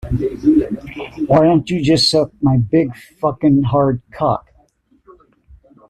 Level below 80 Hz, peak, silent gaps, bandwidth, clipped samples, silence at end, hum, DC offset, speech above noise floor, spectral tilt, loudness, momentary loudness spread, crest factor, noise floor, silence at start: -40 dBFS; -2 dBFS; none; 12.5 kHz; under 0.1%; 1.5 s; none; under 0.1%; 41 dB; -6.5 dB/octave; -16 LUFS; 12 LU; 14 dB; -56 dBFS; 0.05 s